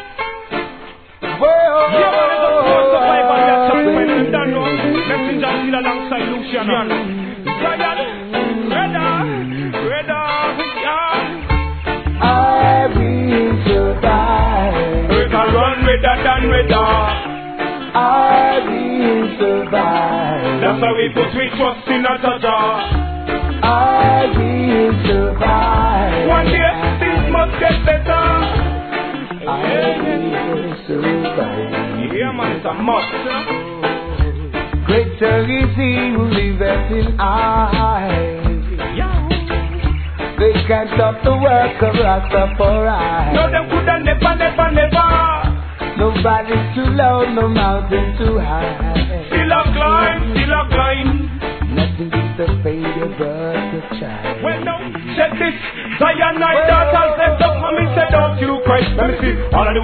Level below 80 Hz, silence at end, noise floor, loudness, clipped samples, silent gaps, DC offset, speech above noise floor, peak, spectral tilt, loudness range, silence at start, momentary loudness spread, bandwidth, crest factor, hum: -24 dBFS; 0 s; -36 dBFS; -15 LUFS; under 0.1%; none; 0.2%; 21 dB; 0 dBFS; -10 dB/octave; 5 LU; 0 s; 9 LU; 4.6 kHz; 14 dB; none